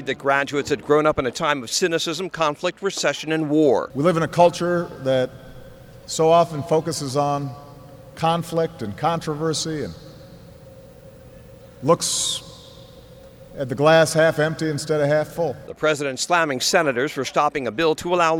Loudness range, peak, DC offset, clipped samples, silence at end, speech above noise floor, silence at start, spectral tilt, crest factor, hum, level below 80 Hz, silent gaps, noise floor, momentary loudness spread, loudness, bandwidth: 6 LU; -2 dBFS; under 0.1%; under 0.1%; 0 s; 24 dB; 0 s; -4 dB/octave; 18 dB; none; -54 dBFS; none; -44 dBFS; 10 LU; -21 LUFS; over 20 kHz